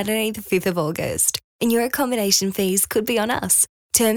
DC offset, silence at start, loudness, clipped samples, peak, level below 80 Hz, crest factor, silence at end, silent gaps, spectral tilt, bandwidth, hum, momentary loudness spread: under 0.1%; 0 s; -20 LUFS; under 0.1%; -2 dBFS; -54 dBFS; 18 dB; 0 s; 1.44-1.59 s, 3.69-3.90 s; -3 dB/octave; over 20 kHz; none; 6 LU